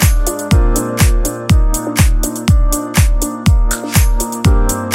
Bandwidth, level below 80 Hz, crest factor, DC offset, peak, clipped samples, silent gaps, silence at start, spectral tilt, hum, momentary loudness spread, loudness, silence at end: 16.5 kHz; -14 dBFS; 12 dB; under 0.1%; 0 dBFS; under 0.1%; none; 0 s; -5 dB/octave; none; 3 LU; -14 LUFS; 0 s